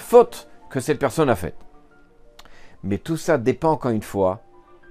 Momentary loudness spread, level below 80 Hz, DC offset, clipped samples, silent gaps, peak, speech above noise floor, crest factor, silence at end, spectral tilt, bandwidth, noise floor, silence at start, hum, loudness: 15 LU; -50 dBFS; under 0.1%; under 0.1%; none; 0 dBFS; 30 dB; 22 dB; 0.55 s; -6.5 dB/octave; 15.5 kHz; -50 dBFS; 0 s; none; -22 LUFS